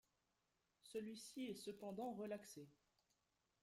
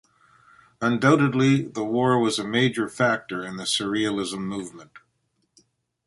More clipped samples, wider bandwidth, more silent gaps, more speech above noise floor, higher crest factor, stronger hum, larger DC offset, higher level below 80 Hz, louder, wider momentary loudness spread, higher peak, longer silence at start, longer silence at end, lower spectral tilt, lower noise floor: neither; first, 16 kHz vs 11.5 kHz; neither; second, 36 dB vs 49 dB; about the same, 16 dB vs 20 dB; neither; neither; second, -88 dBFS vs -62 dBFS; second, -52 LUFS vs -23 LUFS; about the same, 12 LU vs 11 LU; second, -38 dBFS vs -4 dBFS; about the same, 0.85 s vs 0.8 s; second, 0.9 s vs 1.1 s; about the same, -4.5 dB/octave vs -5 dB/octave; first, -88 dBFS vs -72 dBFS